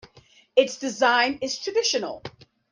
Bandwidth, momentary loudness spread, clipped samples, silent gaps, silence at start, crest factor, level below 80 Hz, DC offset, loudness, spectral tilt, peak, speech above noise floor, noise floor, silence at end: 10 kHz; 15 LU; under 0.1%; none; 0.55 s; 20 dB; -66 dBFS; under 0.1%; -23 LUFS; -1.5 dB/octave; -4 dBFS; 33 dB; -56 dBFS; 0.45 s